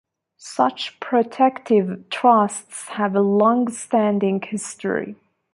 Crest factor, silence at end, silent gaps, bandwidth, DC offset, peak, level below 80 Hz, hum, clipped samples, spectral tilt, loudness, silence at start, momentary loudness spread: 18 dB; 0.4 s; none; 11.5 kHz; under 0.1%; -2 dBFS; -70 dBFS; none; under 0.1%; -5 dB/octave; -20 LUFS; 0.4 s; 12 LU